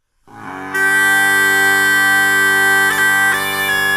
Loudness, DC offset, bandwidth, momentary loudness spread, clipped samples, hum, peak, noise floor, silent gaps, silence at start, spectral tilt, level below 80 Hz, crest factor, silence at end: -12 LUFS; under 0.1%; 16 kHz; 5 LU; under 0.1%; none; -2 dBFS; -36 dBFS; none; 0.35 s; -1 dB/octave; -58 dBFS; 14 dB; 0 s